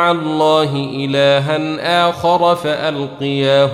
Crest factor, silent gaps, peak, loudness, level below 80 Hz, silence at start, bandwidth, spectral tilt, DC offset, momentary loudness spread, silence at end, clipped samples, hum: 14 dB; none; -2 dBFS; -15 LUFS; -54 dBFS; 0 s; 14 kHz; -6 dB/octave; under 0.1%; 7 LU; 0 s; under 0.1%; none